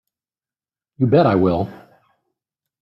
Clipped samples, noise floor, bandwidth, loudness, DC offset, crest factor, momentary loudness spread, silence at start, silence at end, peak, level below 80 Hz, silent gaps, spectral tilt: under 0.1%; under -90 dBFS; 5.8 kHz; -17 LUFS; under 0.1%; 18 dB; 10 LU; 1 s; 1.05 s; -2 dBFS; -56 dBFS; none; -10 dB/octave